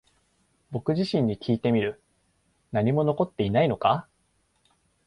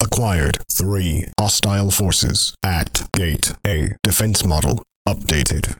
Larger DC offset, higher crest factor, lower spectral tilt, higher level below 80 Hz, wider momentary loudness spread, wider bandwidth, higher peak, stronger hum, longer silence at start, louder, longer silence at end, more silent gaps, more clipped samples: neither; about the same, 18 dB vs 18 dB; first, -8.5 dB/octave vs -3.5 dB/octave; second, -56 dBFS vs -28 dBFS; first, 8 LU vs 5 LU; second, 11 kHz vs 19.5 kHz; second, -10 dBFS vs 0 dBFS; neither; first, 0.7 s vs 0 s; second, -26 LUFS vs -18 LUFS; first, 1.05 s vs 0.05 s; second, none vs 4.96-5.05 s; neither